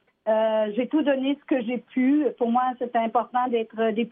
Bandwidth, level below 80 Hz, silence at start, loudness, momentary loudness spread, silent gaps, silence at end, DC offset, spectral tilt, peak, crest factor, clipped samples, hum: 3.8 kHz; -78 dBFS; 0.25 s; -24 LUFS; 4 LU; none; 0.05 s; under 0.1%; -9.5 dB/octave; -10 dBFS; 14 dB; under 0.1%; none